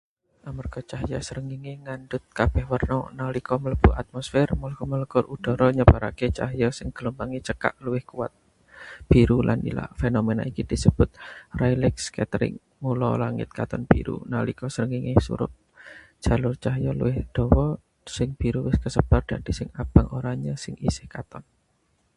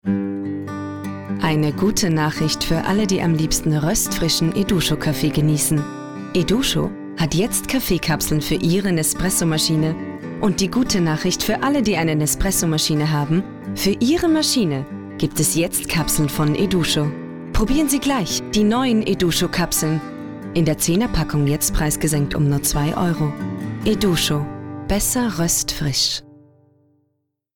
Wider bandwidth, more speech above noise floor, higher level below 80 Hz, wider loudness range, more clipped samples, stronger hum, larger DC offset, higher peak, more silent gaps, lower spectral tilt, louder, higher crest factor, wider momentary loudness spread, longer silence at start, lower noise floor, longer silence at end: second, 11.5 kHz vs 19.5 kHz; second, 44 dB vs 53 dB; about the same, -32 dBFS vs -34 dBFS; about the same, 4 LU vs 2 LU; neither; neither; second, under 0.1% vs 0.4%; first, 0 dBFS vs -8 dBFS; neither; first, -7 dB/octave vs -4.5 dB/octave; second, -25 LUFS vs -19 LUFS; first, 24 dB vs 10 dB; first, 14 LU vs 8 LU; first, 0.45 s vs 0.05 s; about the same, -68 dBFS vs -71 dBFS; second, 0.75 s vs 1.2 s